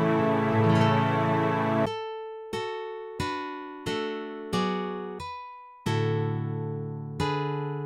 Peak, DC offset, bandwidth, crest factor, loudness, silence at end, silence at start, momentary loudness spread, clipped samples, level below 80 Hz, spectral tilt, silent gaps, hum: -10 dBFS; under 0.1%; 13 kHz; 18 dB; -28 LUFS; 0 s; 0 s; 13 LU; under 0.1%; -60 dBFS; -7 dB/octave; none; none